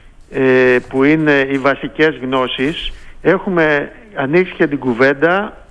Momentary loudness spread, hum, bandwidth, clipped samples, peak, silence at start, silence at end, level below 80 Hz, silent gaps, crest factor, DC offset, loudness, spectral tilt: 8 LU; none; 10 kHz; under 0.1%; -2 dBFS; 0.05 s; 0.15 s; -38 dBFS; none; 14 dB; under 0.1%; -14 LUFS; -7 dB/octave